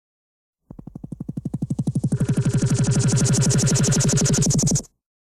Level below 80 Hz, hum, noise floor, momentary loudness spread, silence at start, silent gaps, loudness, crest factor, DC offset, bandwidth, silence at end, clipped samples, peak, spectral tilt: -40 dBFS; none; -40 dBFS; 15 LU; 1.05 s; none; -20 LUFS; 12 dB; under 0.1%; 13.5 kHz; 0.45 s; under 0.1%; -8 dBFS; -5 dB/octave